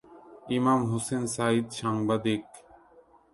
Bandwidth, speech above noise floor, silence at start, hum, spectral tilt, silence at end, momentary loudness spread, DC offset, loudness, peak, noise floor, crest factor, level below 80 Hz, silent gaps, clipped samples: 11.5 kHz; 31 dB; 0.1 s; none; -5.5 dB/octave; 0.75 s; 7 LU; under 0.1%; -28 LUFS; -12 dBFS; -58 dBFS; 18 dB; -64 dBFS; none; under 0.1%